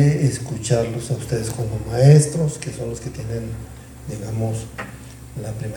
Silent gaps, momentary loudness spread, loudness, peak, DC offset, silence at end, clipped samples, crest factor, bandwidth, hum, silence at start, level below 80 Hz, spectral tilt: none; 20 LU; -21 LUFS; 0 dBFS; under 0.1%; 0 s; under 0.1%; 20 dB; 18.5 kHz; none; 0 s; -42 dBFS; -6.5 dB/octave